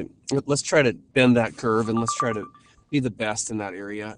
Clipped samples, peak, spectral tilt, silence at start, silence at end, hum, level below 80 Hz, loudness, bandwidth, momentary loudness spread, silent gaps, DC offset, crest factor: under 0.1%; -4 dBFS; -4.5 dB/octave; 0 s; 0.05 s; none; -56 dBFS; -23 LUFS; 11 kHz; 12 LU; none; under 0.1%; 20 dB